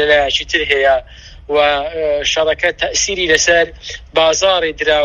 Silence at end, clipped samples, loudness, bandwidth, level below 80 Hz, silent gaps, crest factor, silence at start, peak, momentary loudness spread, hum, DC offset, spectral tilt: 0 s; under 0.1%; -14 LUFS; 10.5 kHz; -38 dBFS; none; 14 dB; 0 s; 0 dBFS; 7 LU; none; under 0.1%; -1 dB/octave